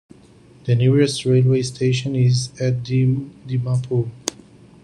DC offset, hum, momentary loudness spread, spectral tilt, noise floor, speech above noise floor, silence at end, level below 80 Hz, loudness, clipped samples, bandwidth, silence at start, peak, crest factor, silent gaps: under 0.1%; none; 10 LU; -6.5 dB/octave; -48 dBFS; 30 dB; 0.5 s; -54 dBFS; -20 LUFS; under 0.1%; 11 kHz; 0.65 s; 0 dBFS; 18 dB; none